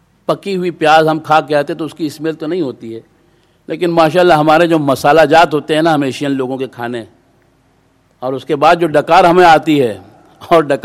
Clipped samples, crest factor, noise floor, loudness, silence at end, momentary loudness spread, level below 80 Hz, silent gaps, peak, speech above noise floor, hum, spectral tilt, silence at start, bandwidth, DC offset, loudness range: 0.2%; 12 dB; -53 dBFS; -12 LUFS; 0.05 s; 14 LU; -50 dBFS; none; 0 dBFS; 42 dB; none; -5.5 dB/octave; 0.3 s; 15.5 kHz; under 0.1%; 6 LU